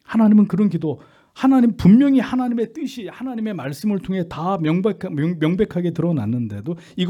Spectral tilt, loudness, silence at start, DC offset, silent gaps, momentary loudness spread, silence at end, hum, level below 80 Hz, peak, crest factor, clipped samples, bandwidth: -8.5 dB/octave; -19 LUFS; 0.1 s; under 0.1%; none; 14 LU; 0 s; none; -50 dBFS; -4 dBFS; 16 dB; under 0.1%; 13 kHz